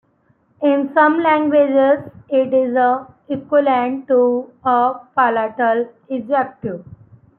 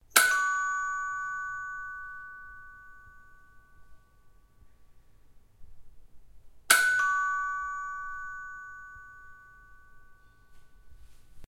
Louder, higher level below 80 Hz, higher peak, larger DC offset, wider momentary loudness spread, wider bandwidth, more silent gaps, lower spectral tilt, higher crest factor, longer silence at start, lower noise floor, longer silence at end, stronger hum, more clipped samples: first, -17 LUFS vs -28 LUFS; second, -64 dBFS vs -58 dBFS; about the same, -2 dBFS vs 0 dBFS; neither; second, 11 LU vs 26 LU; second, 4.2 kHz vs 16 kHz; neither; first, -10 dB/octave vs 1.5 dB/octave; second, 14 dB vs 32 dB; first, 0.6 s vs 0.15 s; about the same, -59 dBFS vs -57 dBFS; first, 0.55 s vs 0 s; neither; neither